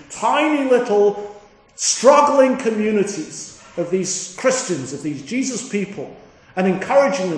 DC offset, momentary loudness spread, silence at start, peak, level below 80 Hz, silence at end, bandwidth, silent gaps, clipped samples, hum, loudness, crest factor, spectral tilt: under 0.1%; 17 LU; 0.1 s; 0 dBFS; -62 dBFS; 0 s; 10.5 kHz; none; under 0.1%; none; -18 LUFS; 18 dB; -4 dB/octave